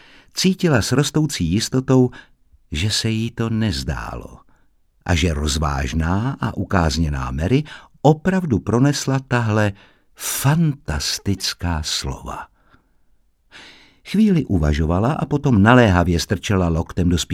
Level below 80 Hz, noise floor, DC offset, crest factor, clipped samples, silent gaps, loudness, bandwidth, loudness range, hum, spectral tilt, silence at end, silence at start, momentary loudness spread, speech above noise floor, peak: -32 dBFS; -57 dBFS; under 0.1%; 20 dB; under 0.1%; none; -19 LUFS; 17 kHz; 6 LU; none; -5.5 dB/octave; 0 s; 0.35 s; 8 LU; 39 dB; 0 dBFS